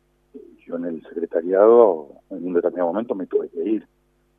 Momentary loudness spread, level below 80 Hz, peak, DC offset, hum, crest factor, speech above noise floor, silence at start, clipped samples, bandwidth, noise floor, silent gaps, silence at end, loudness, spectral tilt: 16 LU; -68 dBFS; -2 dBFS; under 0.1%; none; 20 dB; 26 dB; 0.35 s; under 0.1%; 3.6 kHz; -46 dBFS; none; 0.55 s; -20 LUFS; -10 dB/octave